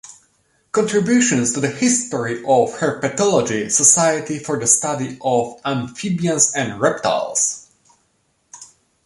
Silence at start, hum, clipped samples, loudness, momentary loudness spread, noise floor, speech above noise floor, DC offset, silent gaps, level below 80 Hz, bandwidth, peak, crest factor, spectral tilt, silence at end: 0.05 s; none; under 0.1%; -17 LUFS; 9 LU; -65 dBFS; 47 dB; under 0.1%; none; -60 dBFS; 11.5 kHz; 0 dBFS; 20 dB; -3.5 dB/octave; 0.4 s